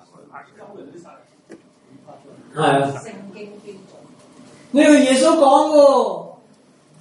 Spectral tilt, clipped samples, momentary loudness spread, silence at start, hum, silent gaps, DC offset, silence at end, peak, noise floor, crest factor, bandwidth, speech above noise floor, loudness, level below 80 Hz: -4.5 dB/octave; under 0.1%; 24 LU; 0.35 s; none; none; under 0.1%; 0.7 s; 0 dBFS; -52 dBFS; 18 dB; 11.5 kHz; 35 dB; -14 LUFS; -70 dBFS